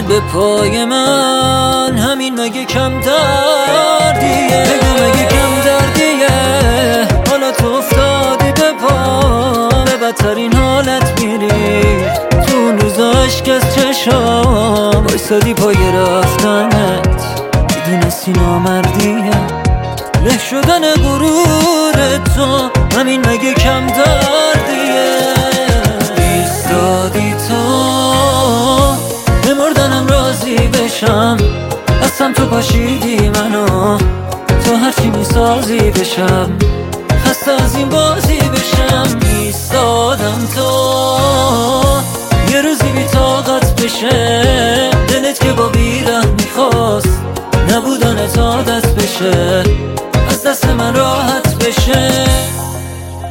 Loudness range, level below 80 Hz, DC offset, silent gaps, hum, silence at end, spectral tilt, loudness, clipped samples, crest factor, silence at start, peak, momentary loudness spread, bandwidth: 2 LU; -20 dBFS; under 0.1%; none; none; 0 s; -4.5 dB/octave; -11 LUFS; under 0.1%; 10 dB; 0 s; 0 dBFS; 4 LU; 17 kHz